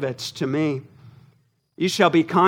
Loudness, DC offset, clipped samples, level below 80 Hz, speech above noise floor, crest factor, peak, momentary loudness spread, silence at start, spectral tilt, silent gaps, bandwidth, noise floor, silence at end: -22 LUFS; under 0.1%; under 0.1%; -70 dBFS; 41 dB; 20 dB; -2 dBFS; 10 LU; 0 s; -5.5 dB/octave; none; 16.5 kHz; -61 dBFS; 0 s